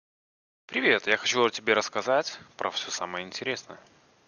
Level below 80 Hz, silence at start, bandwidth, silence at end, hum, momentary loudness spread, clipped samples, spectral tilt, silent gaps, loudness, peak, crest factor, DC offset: -74 dBFS; 0.7 s; 10 kHz; 0.5 s; none; 10 LU; under 0.1%; -2 dB/octave; none; -27 LUFS; -6 dBFS; 24 dB; under 0.1%